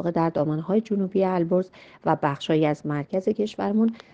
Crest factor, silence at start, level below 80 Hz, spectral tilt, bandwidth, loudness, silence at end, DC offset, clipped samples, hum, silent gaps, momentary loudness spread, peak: 18 dB; 0 s; -64 dBFS; -8 dB/octave; 7.8 kHz; -24 LUFS; 0.15 s; under 0.1%; under 0.1%; none; none; 4 LU; -6 dBFS